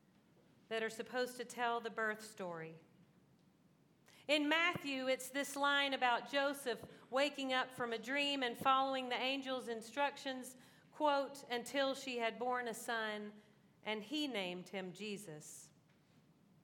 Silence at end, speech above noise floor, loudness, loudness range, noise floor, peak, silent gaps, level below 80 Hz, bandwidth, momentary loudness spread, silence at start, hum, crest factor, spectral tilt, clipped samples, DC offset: 0.95 s; 31 dB; -39 LUFS; 7 LU; -71 dBFS; -20 dBFS; none; -90 dBFS; 18 kHz; 13 LU; 0.7 s; none; 20 dB; -3 dB/octave; under 0.1%; under 0.1%